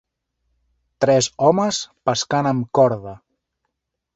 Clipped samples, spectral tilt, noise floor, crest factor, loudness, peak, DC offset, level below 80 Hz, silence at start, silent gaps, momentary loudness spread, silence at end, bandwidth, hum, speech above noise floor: under 0.1%; -4.5 dB/octave; -78 dBFS; 18 dB; -19 LUFS; -2 dBFS; under 0.1%; -58 dBFS; 1 s; none; 6 LU; 1 s; 8.2 kHz; none; 59 dB